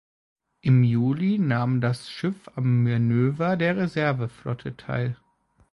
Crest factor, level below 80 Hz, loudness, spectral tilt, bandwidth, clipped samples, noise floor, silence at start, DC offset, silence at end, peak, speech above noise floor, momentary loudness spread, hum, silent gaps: 16 dB; -58 dBFS; -24 LUFS; -8.5 dB/octave; 11.5 kHz; under 0.1%; -64 dBFS; 0.65 s; under 0.1%; 0.6 s; -8 dBFS; 41 dB; 10 LU; none; none